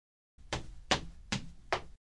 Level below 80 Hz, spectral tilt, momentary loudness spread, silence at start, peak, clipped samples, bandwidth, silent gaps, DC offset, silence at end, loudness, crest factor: -52 dBFS; -3 dB/octave; 8 LU; 0.4 s; -10 dBFS; under 0.1%; 11.5 kHz; none; under 0.1%; 0.15 s; -37 LUFS; 28 dB